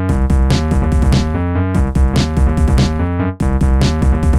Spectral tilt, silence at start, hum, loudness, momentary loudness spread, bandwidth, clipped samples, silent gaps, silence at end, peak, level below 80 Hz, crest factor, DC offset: -7 dB/octave; 0 s; none; -15 LUFS; 3 LU; 12 kHz; under 0.1%; none; 0 s; -2 dBFS; -16 dBFS; 12 dB; 0.7%